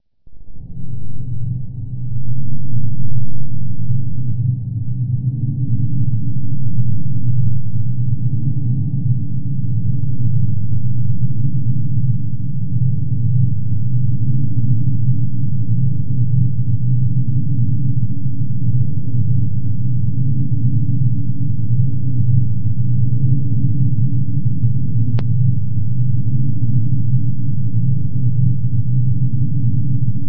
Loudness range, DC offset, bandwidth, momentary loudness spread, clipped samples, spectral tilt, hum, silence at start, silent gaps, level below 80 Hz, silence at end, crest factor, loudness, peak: 3 LU; 20%; 0.9 kHz; 6 LU; under 0.1%; -13.5 dB/octave; none; 0 s; none; -38 dBFS; 0 s; 12 dB; -20 LUFS; -2 dBFS